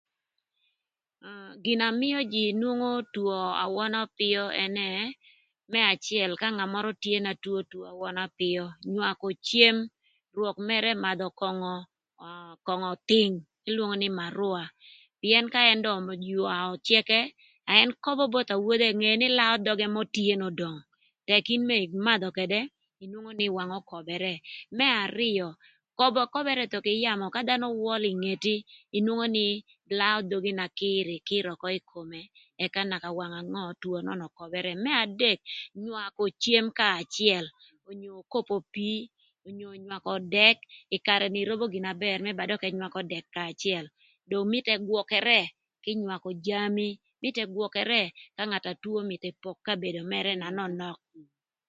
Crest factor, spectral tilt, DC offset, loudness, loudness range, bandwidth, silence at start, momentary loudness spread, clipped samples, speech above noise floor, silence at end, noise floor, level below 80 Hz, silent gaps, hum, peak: 28 dB; -4.5 dB/octave; under 0.1%; -27 LUFS; 6 LU; 8.8 kHz; 1.25 s; 15 LU; under 0.1%; 57 dB; 0.45 s; -86 dBFS; -76 dBFS; none; none; -2 dBFS